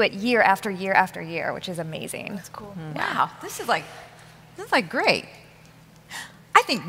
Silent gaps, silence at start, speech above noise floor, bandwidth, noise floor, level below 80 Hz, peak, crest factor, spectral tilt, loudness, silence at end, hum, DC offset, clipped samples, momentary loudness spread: none; 0 s; 25 dB; 16 kHz; -50 dBFS; -62 dBFS; -2 dBFS; 24 dB; -3.5 dB/octave; -24 LUFS; 0 s; none; under 0.1%; under 0.1%; 18 LU